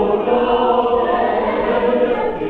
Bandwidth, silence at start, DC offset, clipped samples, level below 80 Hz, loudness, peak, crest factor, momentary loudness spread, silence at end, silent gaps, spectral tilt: 4.6 kHz; 0 s; under 0.1%; under 0.1%; -42 dBFS; -16 LUFS; -4 dBFS; 12 dB; 2 LU; 0 s; none; -8 dB/octave